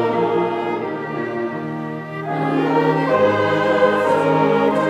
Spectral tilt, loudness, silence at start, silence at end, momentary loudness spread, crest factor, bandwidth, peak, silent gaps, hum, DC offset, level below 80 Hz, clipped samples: -7 dB/octave; -19 LUFS; 0 s; 0 s; 10 LU; 14 dB; 11.5 kHz; -4 dBFS; none; none; under 0.1%; -66 dBFS; under 0.1%